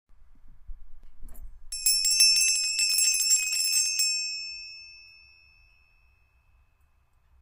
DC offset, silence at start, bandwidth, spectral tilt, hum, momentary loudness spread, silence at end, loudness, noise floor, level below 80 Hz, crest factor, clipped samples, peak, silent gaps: under 0.1%; 0.1 s; 16 kHz; 5 dB/octave; none; 19 LU; 2.4 s; -22 LUFS; -64 dBFS; -50 dBFS; 22 dB; under 0.1%; -6 dBFS; none